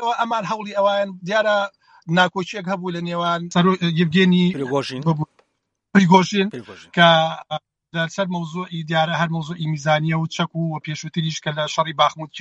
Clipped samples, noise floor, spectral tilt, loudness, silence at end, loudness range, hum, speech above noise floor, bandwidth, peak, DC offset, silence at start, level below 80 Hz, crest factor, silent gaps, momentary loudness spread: under 0.1%; -74 dBFS; -5.5 dB/octave; -20 LUFS; 0 s; 4 LU; none; 54 dB; 8.2 kHz; 0 dBFS; under 0.1%; 0 s; -64 dBFS; 20 dB; none; 12 LU